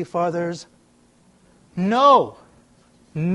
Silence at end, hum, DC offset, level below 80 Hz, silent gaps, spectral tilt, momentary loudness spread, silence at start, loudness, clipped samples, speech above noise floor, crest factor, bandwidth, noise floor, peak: 0 s; none; under 0.1%; -62 dBFS; none; -6.5 dB/octave; 21 LU; 0 s; -19 LUFS; under 0.1%; 38 dB; 20 dB; 11.5 kHz; -57 dBFS; -2 dBFS